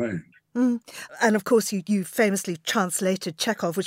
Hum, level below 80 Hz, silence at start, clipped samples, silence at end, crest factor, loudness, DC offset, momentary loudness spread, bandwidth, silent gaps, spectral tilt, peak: none; -72 dBFS; 0 s; under 0.1%; 0 s; 18 dB; -24 LUFS; under 0.1%; 9 LU; 16 kHz; none; -4 dB/octave; -8 dBFS